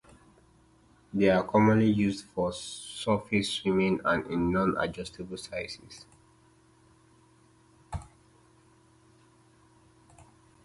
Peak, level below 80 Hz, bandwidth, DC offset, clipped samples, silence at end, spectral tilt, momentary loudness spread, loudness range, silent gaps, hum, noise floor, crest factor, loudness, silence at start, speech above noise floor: -10 dBFS; -54 dBFS; 11.5 kHz; under 0.1%; under 0.1%; 2.6 s; -6 dB/octave; 19 LU; 24 LU; none; none; -61 dBFS; 22 dB; -28 LUFS; 1.15 s; 34 dB